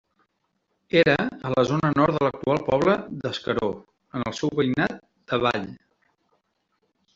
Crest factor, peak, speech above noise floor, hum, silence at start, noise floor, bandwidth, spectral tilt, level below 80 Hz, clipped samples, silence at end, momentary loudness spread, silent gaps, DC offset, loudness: 20 dB; -4 dBFS; 51 dB; none; 0.95 s; -74 dBFS; 7.8 kHz; -6.5 dB/octave; -56 dBFS; under 0.1%; 1.4 s; 10 LU; none; under 0.1%; -24 LUFS